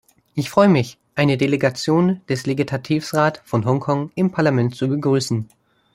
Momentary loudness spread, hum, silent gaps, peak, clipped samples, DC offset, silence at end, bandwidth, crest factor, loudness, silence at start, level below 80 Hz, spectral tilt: 8 LU; none; none; -2 dBFS; under 0.1%; under 0.1%; 0.5 s; 16 kHz; 18 dB; -19 LUFS; 0.35 s; -58 dBFS; -6.5 dB/octave